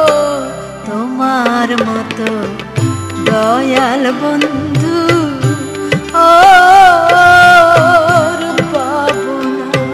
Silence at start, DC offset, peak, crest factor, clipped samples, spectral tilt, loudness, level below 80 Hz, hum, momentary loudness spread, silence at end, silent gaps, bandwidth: 0 s; under 0.1%; 0 dBFS; 10 dB; 0.8%; -5 dB/octave; -10 LUFS; -42 dBFS; none; 13 LU; 0 s; none; 14.5 kHz